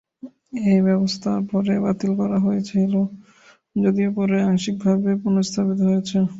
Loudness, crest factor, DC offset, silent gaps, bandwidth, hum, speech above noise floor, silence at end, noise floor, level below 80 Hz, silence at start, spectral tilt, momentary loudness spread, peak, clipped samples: -21 LUFS; 14 dB; under 0.1%; none; 7.8 kHz; none; 22 dB; 0 s; -41 dBFS; -58 dBFS; 0.25 s; -7 dB/octave; 4 LU; -6 dBFS; under 0.1%